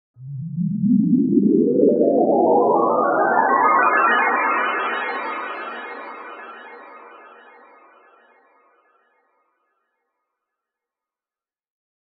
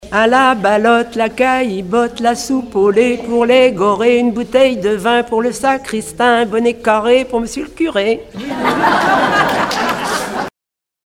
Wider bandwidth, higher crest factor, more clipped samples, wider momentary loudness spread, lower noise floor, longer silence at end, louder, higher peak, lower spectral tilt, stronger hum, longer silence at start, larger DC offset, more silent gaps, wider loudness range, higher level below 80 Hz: second, 4.8 kHz vs 16 kHz; about the same, 18 dB vs 14 dB; neither; first, 20 LU vs 8 LU; first, under -90 dBFS vs -84 dBFS; first, 4.9 s vs 0.55 s; second, -18 LUFS vs -14 LUFS; about the same, -2 dBFS vs 0 dBFS; first, -5.5 dB/octave vs -4 dB/octave; neither; first, 0.2 s vs 0 s; neither; neither; first, 19 LU vs 2 LU; second, -68 dBFS vs -46 dBFS